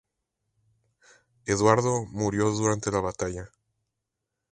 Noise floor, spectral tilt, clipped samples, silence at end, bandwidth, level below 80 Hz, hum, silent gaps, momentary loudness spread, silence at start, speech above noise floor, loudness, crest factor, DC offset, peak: -84 dBFS; -5.5 dB/octave; under 0.1%; 1.05 s; 11 kHz; -52 dBFS; none; none; 12 LU; 1.45 s; 59 dB; -26 LUFS; 24 dB; under 0.1%; -4 dBFS